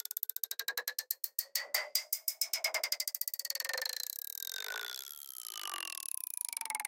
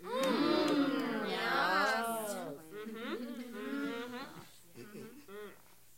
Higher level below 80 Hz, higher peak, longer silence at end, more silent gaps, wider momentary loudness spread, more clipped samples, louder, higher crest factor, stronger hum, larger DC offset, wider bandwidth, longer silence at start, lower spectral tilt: second, under -90 dBFS vs -78 dBFS; first, -14 dBFS vs -18 dBFS; second, 0 s vs 0.4 s; neither; second, 7 LU vs 20 LU; neither; about the same, -36 LUFS vs -35 LUFS; first, 26 dB vs 18 dB; neither; neither; about the same, 17 kHz vs 16.5 kHz; about the same, 0.1 s vs 0 s; second, 6 dB/octave vs -4 dB/octave